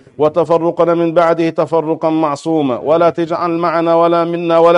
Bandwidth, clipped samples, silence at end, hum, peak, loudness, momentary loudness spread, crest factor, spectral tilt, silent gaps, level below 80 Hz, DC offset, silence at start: 10 kHz; under 0.1%; 0 s; none; 0 dBFS; -14 LUFS; 4 LU; 12 dB; -7.5 dB/octave; none; -58 dBFS; under 0.1%; 0.2 s